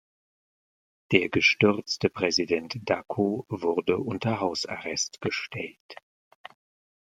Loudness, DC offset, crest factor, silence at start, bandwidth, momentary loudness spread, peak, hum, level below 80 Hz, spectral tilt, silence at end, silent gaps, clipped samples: -26 LUFS; under 0.1%; 26 dB; 1.1 s; 11.5 kHz; 10 LU; -4 dBFS; none; -66 dBFS; -4 dB/octave; 1.2 s; 5.80-5.89 s; under 0.1%